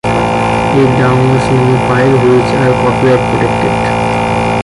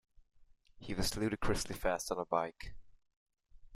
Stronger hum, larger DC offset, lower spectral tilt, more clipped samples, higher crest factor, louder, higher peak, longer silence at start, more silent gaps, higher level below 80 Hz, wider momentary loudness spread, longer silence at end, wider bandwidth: neither; neither; first, -7 dB/octave vs -4 dB/octave; neither; second, 8 dB vs 22 dB; first, -10 LUFS vs -37 LUFS; first, 0 dBFS vs -18 dBFS; second, 0.05 s vs 0.4 s; second, none vs 3.16-3.26 s; first, -30 dBFS vs -50 dBFS; second, 4 LU vs 16 LU; about the same, 0 s vs 0 s; second, 11.5 kHz vs 15.5 kHz